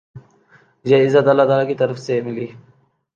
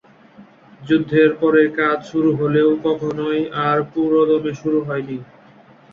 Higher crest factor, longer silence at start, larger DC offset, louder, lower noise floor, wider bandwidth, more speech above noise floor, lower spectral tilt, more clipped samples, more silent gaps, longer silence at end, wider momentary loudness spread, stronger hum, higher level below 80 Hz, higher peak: about the same, 16 dB vs 16 dB; second, 0.15 s vs 0.4 s; neither; about the same, -16 LUFS vs -18 LUFS; first, -53 dBFS vs -47 dBFS; about the same, 7.4 kHz vs 6.8 kHz; first, 37 dB vs 30 dB; about the same, -7 dB/octave vs -8 dB/octave; neither; neither; about the same, 0.6 s vs 0.7 s; first, 16 LU vs 7 LU; neither; second, -66 dBFS vs -58 dBFS; about the same, -2 dBFS vs -2 dBFS